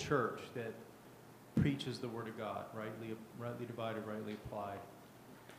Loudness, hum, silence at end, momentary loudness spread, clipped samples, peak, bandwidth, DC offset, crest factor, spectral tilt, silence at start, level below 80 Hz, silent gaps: -42 LUFS; none; 0 s; 21 LU; under 0.1%; -20 dBFS; 15.5 kHz; under 0.1%; 22 dB; -6.5 dB/octave; 0 s; -64 dBFS; none